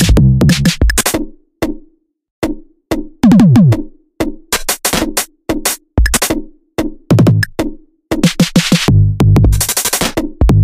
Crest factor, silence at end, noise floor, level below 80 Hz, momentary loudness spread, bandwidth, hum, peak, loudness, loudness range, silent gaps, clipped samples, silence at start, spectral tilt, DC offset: 12 dB; 0 s; -47 dBFS; -20 dBFS; 12 LU; 16.5 kHz; none; 0 dBFS; -13 LUFS; 3 LU; 2.31-2.42 s; under 0.1%; 0 s; -5 dB/octave; under 0.1%